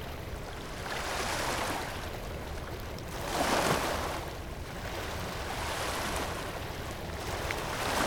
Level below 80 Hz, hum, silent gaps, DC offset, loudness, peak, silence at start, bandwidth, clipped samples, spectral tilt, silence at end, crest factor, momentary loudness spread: -44 dBFS; none; none; under 0.1%; -34 LUFS; -14 dBFS; 0 s; 19 kHz; under 0.1%; -3.5 dB/octave; 0 s; 20 dB; 11 LU